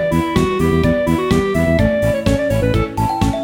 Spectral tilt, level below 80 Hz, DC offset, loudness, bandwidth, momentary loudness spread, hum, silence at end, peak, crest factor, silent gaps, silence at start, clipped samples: -7 dB/octave; -28 dBFS; under 0.1%; -16 LUFS; 17.5 kHz; 3 LU; none; 0 s; -2 dBFS; 14 dB; none; 0 s; under 0.1%